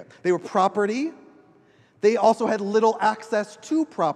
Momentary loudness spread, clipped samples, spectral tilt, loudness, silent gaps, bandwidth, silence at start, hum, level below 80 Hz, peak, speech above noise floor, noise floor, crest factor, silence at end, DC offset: 8 LU; under 0.1%; -5.5 dB/octave; -23 LUFS; none; 10 kHz; 0 s; none; -78 dBFS; -6 dBFS; 35 dB; -57 dBFS; 18 dB; 0 s; under 0.1%